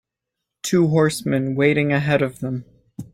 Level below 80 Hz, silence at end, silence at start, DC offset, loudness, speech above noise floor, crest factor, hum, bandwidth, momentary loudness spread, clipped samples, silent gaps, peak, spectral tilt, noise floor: -56 dBFS; 0.1 s; 0.65 s; under 0.1%; -20 LUFS; 63 dB; 16 dB; none; 16 kHz; 13 LU; under 0.1%; none; -4 dBFS; -6 dB/octave; -82 dBFS